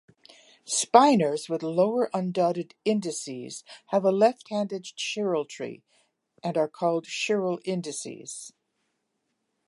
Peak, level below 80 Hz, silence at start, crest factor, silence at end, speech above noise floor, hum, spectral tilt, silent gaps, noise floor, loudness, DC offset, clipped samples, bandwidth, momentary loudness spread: -2 dBFS; -80 dBFS; 0.65 s; 24 dB; 1.2 s; 52 dB; none; -4.5 dB/octave; none; -78 dBFS; -26 LUFS; under 0.1%; under 0.1%; 11.5 kHz; 17 LU